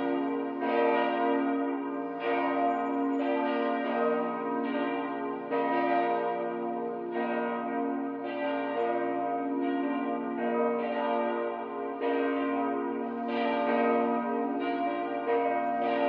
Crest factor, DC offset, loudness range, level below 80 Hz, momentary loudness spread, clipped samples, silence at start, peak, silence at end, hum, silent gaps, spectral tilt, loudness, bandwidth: 14 dB; under 0.1%; 2 LU; under -90 dBFS; 6 LU; under 0.1%; 0 s; -14 dBFS; 0 s; none; none; -8 dB/octave; -30 LUFS; 5.2 kHz